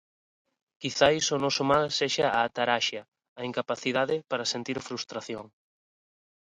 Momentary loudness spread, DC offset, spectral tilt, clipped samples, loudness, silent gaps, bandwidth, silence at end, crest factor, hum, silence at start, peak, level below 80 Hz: 13 LU; under 0.1%; -3 dB/octave; under 0.1%; -27 LUFS; 3.28-3.36 s; 11 kHz; 1 s; 22 dB; none; 0.8 s; -8 dBFS; -64 dBFS